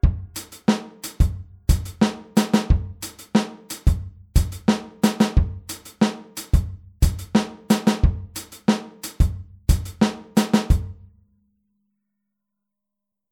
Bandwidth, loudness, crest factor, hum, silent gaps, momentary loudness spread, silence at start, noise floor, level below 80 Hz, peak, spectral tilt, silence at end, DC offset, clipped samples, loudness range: 19 kHz; -23 LUFS; 18 dB; none; none; 13 LU; 0.05 s; -85 dBFS; -26 dBFS; -4 dBFS; -6 dB/octave; 2.4 s; under 0.1%; under 0.1%; 2 LU